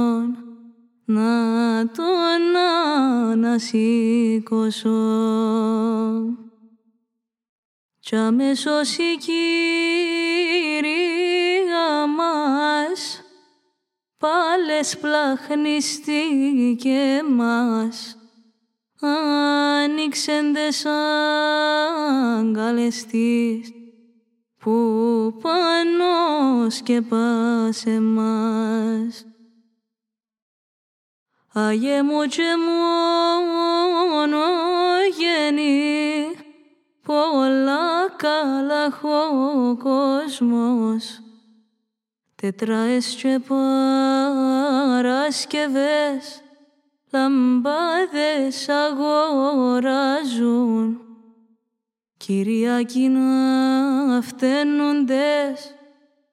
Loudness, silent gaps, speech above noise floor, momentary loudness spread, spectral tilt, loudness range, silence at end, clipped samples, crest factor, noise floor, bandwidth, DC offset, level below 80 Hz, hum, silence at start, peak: -20 LUFS; 7.49-7.89 s, 30.42-31.26 s; 68 dB; 6 LU; -4 dB/octave; 4 LU; 0.6 s; under 0.1%; 16 dB; -87 dBFS; 13.5 kHz; under 0.1%; -82 dBFS; none; 0 s; -6 dBFS